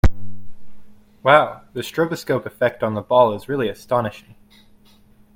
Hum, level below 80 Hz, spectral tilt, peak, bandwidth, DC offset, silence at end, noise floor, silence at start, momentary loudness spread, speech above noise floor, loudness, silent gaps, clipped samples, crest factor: none; -34 dBFS; -6 dB/octave; 0 dBFS; 16.5 kHz; under 0.1%; 1.15 s; -51 dBFS; 0.05 s; 12 LU; 31 dB; -20 LUFS; none; under 0.1%; 20 dB